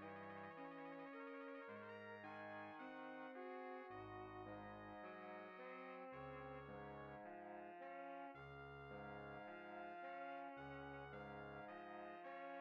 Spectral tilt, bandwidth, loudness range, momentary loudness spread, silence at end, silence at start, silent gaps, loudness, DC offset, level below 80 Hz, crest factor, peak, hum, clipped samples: -4.5 dB/octave; 6.4 kHz; 1 LU; 2 LU; 0 s; 0 s; none; -55 LUFS; under 0.1%; -78 dBFS; 12 dB; -42 dBFS; none; under 0.1%